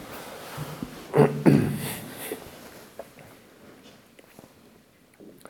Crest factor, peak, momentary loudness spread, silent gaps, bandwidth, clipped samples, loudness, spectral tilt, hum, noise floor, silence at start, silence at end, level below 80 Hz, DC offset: 24 dB; -4 dBFS; 24 LU; none; 19.5 kHz; under 0.1%; -26 LUFS; -6.5 dB/octave; none; -57 dBFS; 0 s; 0.2 s; -58 dBFS; under 0.1%